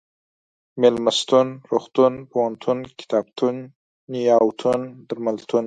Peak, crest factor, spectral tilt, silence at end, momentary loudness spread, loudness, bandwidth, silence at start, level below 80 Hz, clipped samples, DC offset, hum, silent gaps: -2 dBFS; 18 dB; -5 dB/octave; 0 s; 10 LU; -21 LUFS; 9.4 kHz; 0.75 s; -66 dBFS; under 0.1%; under 0.1%; none; 3.76-4.08 s